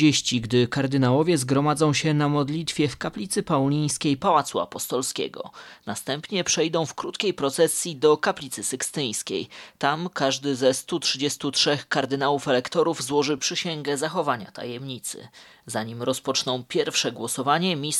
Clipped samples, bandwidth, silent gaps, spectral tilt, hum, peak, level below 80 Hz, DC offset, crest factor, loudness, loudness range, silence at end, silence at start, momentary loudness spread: under 0.1%; 15 kHz; none; -4 dB/octave; none; -6 dBFS; -62 dBFS; under 0.1%; 20 dB; -24 LUFS; 5 LU; 0 s; 0 s; 10 LU